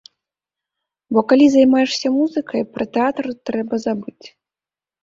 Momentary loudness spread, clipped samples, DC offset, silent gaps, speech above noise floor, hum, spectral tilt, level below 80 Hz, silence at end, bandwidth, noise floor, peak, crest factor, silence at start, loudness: 12 LU; under 0.1%; under 0.1%; none; over 73 dB; none; -5 dB/octave; -60 dBFS; 0.75 s; 7.6 kHz; under -90 dBFS; -2 dBFS; 16 dB; 1.1 s; -17 LUFS